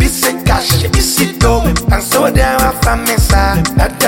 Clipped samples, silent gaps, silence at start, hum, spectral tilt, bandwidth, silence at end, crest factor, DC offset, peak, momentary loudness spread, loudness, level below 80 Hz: under 0.1%; none; 0 s; none; -4 dB/octave; 17 kHz; 0 s; 10 dB; under 0.1%; 0 dBFS; 2 LU; -12 LUFS; -16 dBFS